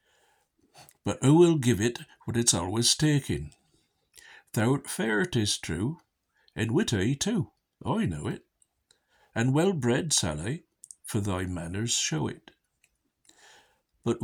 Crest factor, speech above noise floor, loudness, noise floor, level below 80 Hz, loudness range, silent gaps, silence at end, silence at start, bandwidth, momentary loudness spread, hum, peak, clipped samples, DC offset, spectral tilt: 20 dB; 45 dB; -27 LUFS; -72 dBFS; -54 dBFS; 6 LU; none; 0 s; 0.8 s; over 20 kHz; 14 LU; none; -8 dBFS; under 0.1%; under 0.1%; -4.5 dB/octave